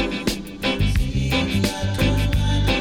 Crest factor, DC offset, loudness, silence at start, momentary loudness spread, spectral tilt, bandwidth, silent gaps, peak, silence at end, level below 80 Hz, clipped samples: 12 dB; under 0.1%; -22 LUFS; 0 s; 5 LU; -5.5 dB/octave; 17 kHz; none; -8 dBFS; 0 s; -26 dBFS; under 0.1%